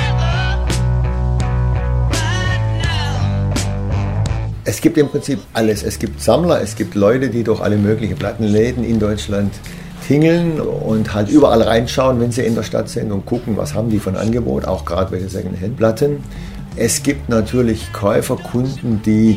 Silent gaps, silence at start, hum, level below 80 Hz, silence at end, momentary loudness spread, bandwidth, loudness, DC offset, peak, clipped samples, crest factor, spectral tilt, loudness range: none; 0 s; none; -26 dBFS; 0 s; 7 LU; 16 kHz; -17 LUFS; under 0.1%; 0 dBFS; under 0.1%; 16 dB; -6 dB/octave; 4 LU